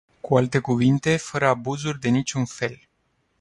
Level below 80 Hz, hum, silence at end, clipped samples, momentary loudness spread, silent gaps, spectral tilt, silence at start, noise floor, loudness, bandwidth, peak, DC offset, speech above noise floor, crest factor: -56 dBFS; none; 0.65 s; under 0.1%; 8 LU; none; -6 dB/octave; 0.25 s; -69 dBFS; -23 LUFS; 11.5 kHz; -6 dBFS; under 0.1%; 47 dB; 18 dB